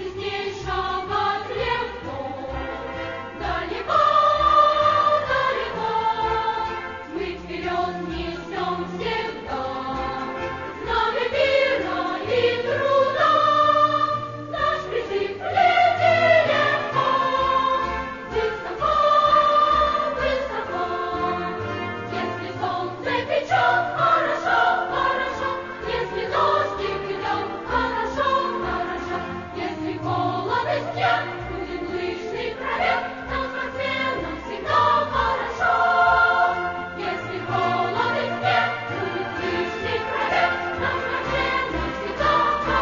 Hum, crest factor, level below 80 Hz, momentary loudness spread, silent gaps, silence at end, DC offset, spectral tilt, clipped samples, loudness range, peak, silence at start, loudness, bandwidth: none; 16 dB; -44 dBFS; 12 LU; none; 0 s; under 0.1%; -5 dB/octave; under 0.1%; 6 LU; -6 dBFS; 0 s; -22 LUFS; 7.4 kHz